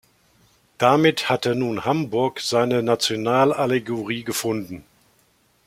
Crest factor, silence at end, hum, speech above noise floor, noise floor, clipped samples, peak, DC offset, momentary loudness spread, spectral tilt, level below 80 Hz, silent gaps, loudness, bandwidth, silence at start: 20 dB; 0.85 s; none; 41 dB; -61 dBFS; under 0.1%; -2 dBFS; under 0.1%; 9 LU; -4.5 dB/octave; -62 dBFS; none; -21 LUFS; 16.5 kHz; 0.8 s